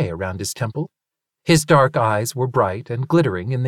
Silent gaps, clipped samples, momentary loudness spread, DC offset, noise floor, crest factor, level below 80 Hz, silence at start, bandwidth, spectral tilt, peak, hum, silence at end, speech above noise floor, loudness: none; under 0.1%; 12 LU; under 0.1%; -74 dBFS; 18 dB; -52 dBFS; 0 s; 17 kHz; -5.5 dB/octave; -2 dBFS; none; 0 s; 55 dB; -19 LUFS